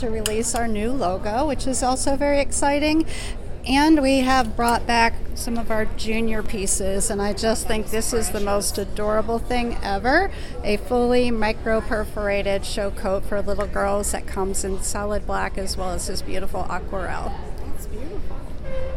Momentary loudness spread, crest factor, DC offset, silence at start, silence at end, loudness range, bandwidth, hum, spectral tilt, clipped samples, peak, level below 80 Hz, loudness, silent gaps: 11 LU; 18 dB; under 0.1%; 0 s; 0 s; 7 LU; 16.5 kHz; none; -4 dB/octave; under 0.1%; -4 dBFS; -30 dBFS; -23 LUFS; none